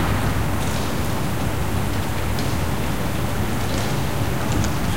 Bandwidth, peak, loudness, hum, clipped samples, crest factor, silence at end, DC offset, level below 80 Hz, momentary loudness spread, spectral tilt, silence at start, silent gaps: 16 kHz; -6 dBFS; -23 LUFS; none; under 0.1%; 16 dB; 0 s; 5%; -30 dBFS; 2 LU; -5.5 dB/octave; 0 s; none